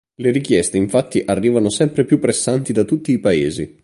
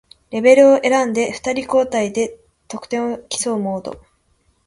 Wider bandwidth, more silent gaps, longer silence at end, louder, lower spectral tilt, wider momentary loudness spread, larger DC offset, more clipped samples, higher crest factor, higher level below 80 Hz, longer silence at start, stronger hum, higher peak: about the same, 11.5 kHz vs 11.5 kHz; neither; second, 0.15 s vs 0.7 s; about the same, -17 LUFS vs -17 LUFS; first, -5.5 dB/octave vs -4 dB/octave; second, 3 LU vs 17 LU; neither; neither; about the same, 16 dB vs 18 dB; first, -48 dBFS vs -56 dBFS; about the same, 0.2 s vs 0.3 s; neither; about the same, -2 dBFS vs 0 dBFS